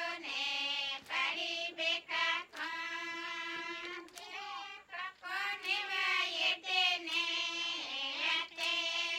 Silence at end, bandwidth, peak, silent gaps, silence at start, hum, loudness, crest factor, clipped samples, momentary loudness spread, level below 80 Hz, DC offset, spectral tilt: 0 s; 16.5 kHz; -18 dBFS; none; 0 s; none; -34 LUFS; 18 dB; under 0.1%; 12 LU; -82 dBFS; under 0.1%; 0.5 dB/octave